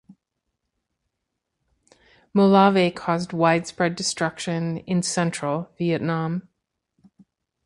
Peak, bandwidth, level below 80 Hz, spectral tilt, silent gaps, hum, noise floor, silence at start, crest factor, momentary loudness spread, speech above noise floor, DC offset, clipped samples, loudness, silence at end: -4 dBFS; 11.5 kHz; -64 dBFS; -5.5 dB/octave; none; none; -80 dBFS; 0.1 s; 22 dB; 11 LU; 59 dB; under 0.1%; under 0.1%; -22 LUFS; 1.25 s